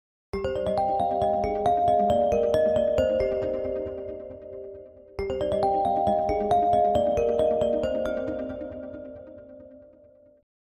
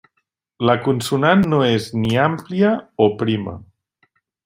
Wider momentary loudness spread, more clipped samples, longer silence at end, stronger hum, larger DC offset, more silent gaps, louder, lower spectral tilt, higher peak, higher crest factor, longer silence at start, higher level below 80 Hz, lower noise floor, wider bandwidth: first, 18 LU vs 7 LU; neither; first, 0.95 s vs 0.8 s; neither; neither; neither; second, -25 LUFS vs -18 LUFS; about the same, -7 dB/octave vs -6.5 dB/octave; second, -10 dBFS vs -2 dBFS; about the same, 14 dB vs 18 dB; second, 0.35 s vs 0.6 s; first, -46 dBFS vs -54 dBFS; second, -55 dBFS vs -72 dBFS; second, 10 kHz vs 16 kHz